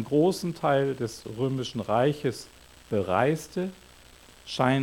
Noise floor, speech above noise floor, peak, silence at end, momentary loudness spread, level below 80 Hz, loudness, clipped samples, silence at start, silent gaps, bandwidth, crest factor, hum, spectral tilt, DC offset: -52 dBFS; 26 dB; -8 dBFS; 0 s; 11 LU; -60 dBFS; -27 LUFS; under 0.1%; 0 s; none; 18 kHz; 20 dB; none; -6 dB/octave; under 0.1%